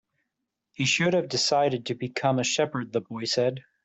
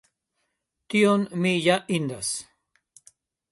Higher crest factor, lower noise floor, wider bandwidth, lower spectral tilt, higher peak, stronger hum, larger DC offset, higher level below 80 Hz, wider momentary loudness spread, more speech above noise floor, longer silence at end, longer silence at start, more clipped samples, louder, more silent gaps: about the same, 16 dB vs 20 dB; first, -83 dBFS vs -78 dBFS; second, 8.2 kHz vs 11.5 kHz; about the same, -4 dB/octave vs -4.5 dB/octave; second, -10 dBFS vs -6 dBFS; neither; neither; about the same, -68 dBFS vs -66 dBFS; about the same, 8 LU vs 9 LU; about the same, 57 dB vs 55 dB; second, 0.25 s vs 1.1 s; about the same, 0.8 s vs 0.9 s; neither; about the same, -26 LUFS vs -24 LUFS; neither